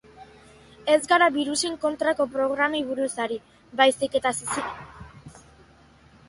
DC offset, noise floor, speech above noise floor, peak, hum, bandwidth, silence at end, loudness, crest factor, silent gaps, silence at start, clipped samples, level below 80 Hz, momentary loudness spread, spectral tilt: under 0.1%; -54 dBFS; 31 dB; -6 dBFS; none; 11.5 kHz; 0.9 s; -24 LUFS; 20 dB; none; 0.2 s; under 0.1%; -58 dBFS; 16 LU; -2.5 dB/octave